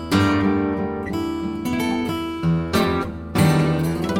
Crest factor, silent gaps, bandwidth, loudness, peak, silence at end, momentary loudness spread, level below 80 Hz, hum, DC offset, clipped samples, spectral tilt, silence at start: 16 dB; none; 16.5 kHz; -21 LUFS; -6 dBFS; 0 s; 8 LU; -40 dBFS; none; under 0.1%; under 0.1%; -6.5 dB/octave; 0 s